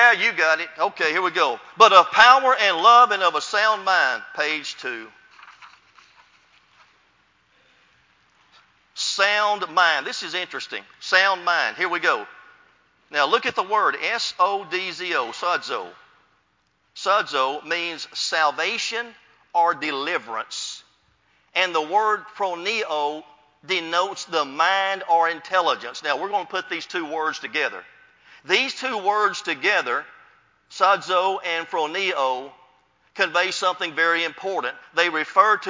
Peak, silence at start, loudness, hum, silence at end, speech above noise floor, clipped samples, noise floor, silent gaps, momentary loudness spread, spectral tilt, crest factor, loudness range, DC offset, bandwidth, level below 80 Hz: 0 dBFS; 0 s; -21 LUFS; none; 0 s; 45 dB; under 0.1%; -67 dBFS; none; 12 LU; -1 dB/octave; 22 dB; 10 LU; under 0.1%; 7.6 kHz; -76 dBFS